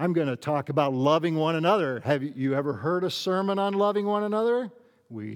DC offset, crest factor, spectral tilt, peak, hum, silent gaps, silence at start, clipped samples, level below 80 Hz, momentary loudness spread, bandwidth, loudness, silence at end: under 0.1%; 16 dB; -6.5 dB/octave; -8 dBFS; none; none; 0 s; under 0.1%; -80 dBFS; 5 LU; 18 kHz; -26 LUFS; 0 s